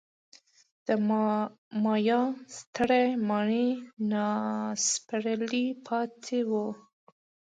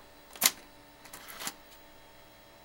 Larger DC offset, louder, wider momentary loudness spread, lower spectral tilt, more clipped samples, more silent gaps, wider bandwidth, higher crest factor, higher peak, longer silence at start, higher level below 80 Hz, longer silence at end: neither; about the same, -29 LUFS vs -30 LUFS; second, 7 LU vs 27 LU; first, -4 dB/octave vs 1 dB/octave; neither; first, 1.58-1.71 s, 2.67-2.73 s, 3.93-3.97 s vs none; second, 9.4 kHz vs 17 kHz; second, 18 dB vs 34 dB; second, -12 dBFS vs -4 dBFS; first, 0.85 s vs 0 s; second, -72 dBFS vs -66 dBFS; first, 0.8 s vs 0 s